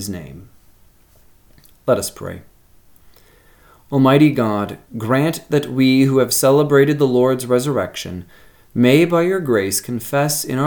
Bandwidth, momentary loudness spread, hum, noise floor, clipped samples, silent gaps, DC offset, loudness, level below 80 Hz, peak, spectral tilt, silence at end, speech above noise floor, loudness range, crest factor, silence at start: 19 kHz; 16 LU; none; -50 dBFS; under 0.1%; none; under 0.1%; -16 LUFS; -54 dBFS; 0 dBFS; -5.5 dB/octave; 0 s; 34 dB; 12 LU; 18 dB; 0 s